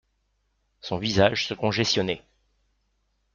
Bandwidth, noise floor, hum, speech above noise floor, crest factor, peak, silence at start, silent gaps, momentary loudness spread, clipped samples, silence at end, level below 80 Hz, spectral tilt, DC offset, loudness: 7.4 kHz; -72 dBFS; none; 48 dB; 22 dB; -6 dBFS; 0.85 s; none; 12 LU; under 0.1%; 1.15 s; -56 dBFS; -4.5 dB/octave; under 0.1%; -24 LUFS